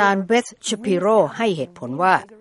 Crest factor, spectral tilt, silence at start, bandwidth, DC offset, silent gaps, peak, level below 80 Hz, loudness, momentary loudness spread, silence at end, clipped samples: 18 dB; -4.5 dB/octave; 0 s; 11.5 kHz; under 0.1%; none; -2 dBFS; -66 dBFS; -20 LUFS; 9 LU; 0.05 s; under 0.1%